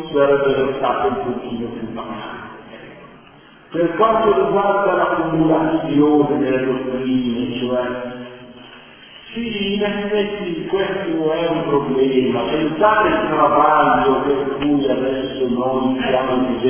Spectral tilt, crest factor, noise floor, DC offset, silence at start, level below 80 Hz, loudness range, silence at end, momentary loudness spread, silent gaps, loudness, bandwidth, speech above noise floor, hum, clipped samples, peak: -10 dB/octave; 16 dB; -45 dBFS; under 0.1%; 0 s; -48 dBFS; 7 LU; 0 s; 14 LU; none; -18 LUFS; 3.5 kHz; 28 dB; none; under 0.1%; -2 dBFS